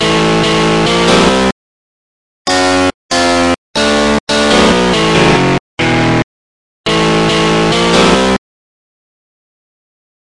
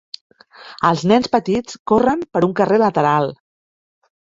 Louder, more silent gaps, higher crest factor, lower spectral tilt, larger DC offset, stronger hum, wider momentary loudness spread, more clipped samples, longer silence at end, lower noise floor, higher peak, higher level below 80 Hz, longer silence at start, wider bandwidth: first, -10 LUFS vs -17 LUFS; first, 1.52-2.45 s, 2.94-3.09 s, 3.58-3.74 s, 4.20-4.27 s, 5.60-5.77 s, 6.24-6.84 s vs 1.79-1.85 s; second, 12 dB vs 18 dB; second, -4.5 dB/octave vs -6.5 dB/octave; first, 1% vs under 0.1%; neither; second, 6 LU vs 10 LU; neither; first, 1.9 s vs 1 s; first, under -90 dBFS vs -41 dBFS; about the same, 0 dBFS vs -2 dBFS; first, -32 dBFS vs -52 dBFS; second, 0 s vs 0.6 s; first, 11.5 kHz vs 7.8 kHz